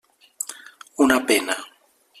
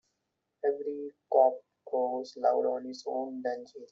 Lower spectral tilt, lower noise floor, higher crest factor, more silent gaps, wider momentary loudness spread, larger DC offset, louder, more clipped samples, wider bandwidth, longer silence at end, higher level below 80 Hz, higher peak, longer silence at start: about the same, -1.5 dB/octave vs -2.5 dB/octave; second, -56 dBFS vs -83 dBFS; about the same, 22 dB vs 20 dB; neither; first, 22 LU vs 12 LU; neither; first, -22 LUFS vs -31 LUFS; neither; first, 14.5 kHz vs 7.6 kHz; first, 0.55 s vs 0.05 s; first, -62 dBFS vs -84 dBFS; first, -2 dBFS vs -10 dBFS; second, 0.4 s vs 0.65 s